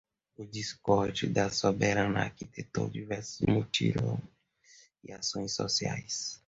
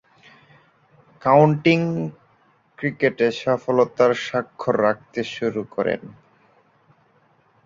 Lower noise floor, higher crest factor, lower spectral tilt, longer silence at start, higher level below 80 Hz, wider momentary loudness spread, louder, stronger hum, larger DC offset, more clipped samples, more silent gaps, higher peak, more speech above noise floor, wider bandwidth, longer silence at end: about the same, -61 dBFS vs -60 dBFS; about the same, 20 dB vs 20 dB; second, -4.5 dB/octave vs -7 dB/octave; second, 0.4 s vs 1.25 s; first, -56 dBFS vs -62 dBFS; about the same, 10 LU vs 12 LU; second, -31 LUFS vs -21 LUFS; neither; neither; neither; neither; second, -12 dBFS vs -2 dBFS; second, 30 dB vs 40 dB; about the same, 8 kHz vs 7.6 kHz; second, 0.1 s vs 1.55 s